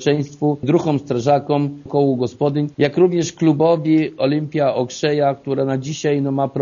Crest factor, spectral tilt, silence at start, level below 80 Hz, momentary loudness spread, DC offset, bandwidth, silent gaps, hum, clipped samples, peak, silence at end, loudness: 16 dB; -6.5 dB/octave; 0 s; -58 dBFS; 5 LU; under 0.1%; 7.4 kHz; none; none; under 0.1%; -2 dBFS; 0 s; -18 LUFS